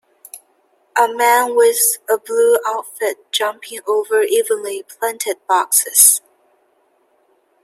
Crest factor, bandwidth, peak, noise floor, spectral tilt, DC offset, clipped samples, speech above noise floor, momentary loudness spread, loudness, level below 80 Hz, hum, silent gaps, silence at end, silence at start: 18 dB; 16 kHz; 0 dBFS; -60 dBFS; 1.5 dB/octave; under 0.1%; under 0.1%; 44 dB; 13 LU; -15 LUFS; -76 dBFS; none; none; 1.45 s; 0.35 s